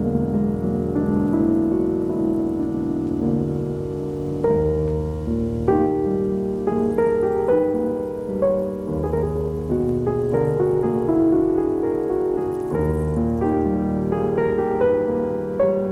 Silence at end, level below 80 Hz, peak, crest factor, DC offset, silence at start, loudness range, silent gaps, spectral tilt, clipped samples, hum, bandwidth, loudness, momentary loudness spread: 0 s; -38 dBFS; -6 dBFS; 14 dB; under 0.1%; 0 s; 2 LU; none; -10 dB/octave; under 0.1%; none; 12 kHz; -21 LUFS; 5 LU